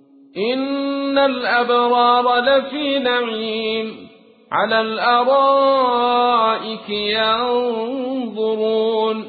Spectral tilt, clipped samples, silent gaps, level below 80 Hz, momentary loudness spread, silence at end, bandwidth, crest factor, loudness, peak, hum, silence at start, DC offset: -9 dB/octave; under 0.1%; none; -60 dBFS; 9 LU; 0 s; 4.8 kHz; 14 dB; -17 LUFS; -4 dBFS; none; 0.35 s; under 0.1%